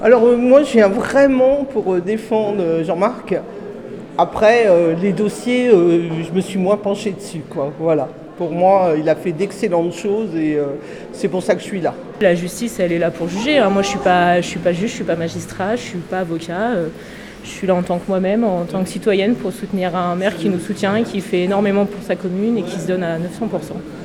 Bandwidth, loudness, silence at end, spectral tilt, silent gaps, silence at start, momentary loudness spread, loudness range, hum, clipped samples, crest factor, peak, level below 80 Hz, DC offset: 15.5 kHz; -17 LUFS; 0 s; -6 dB/octave; none; 0 s; 11 LU; 5 LU; none; under 0.1%; 16 dB; 0 dBFS; -50 dBFS; under 0.1%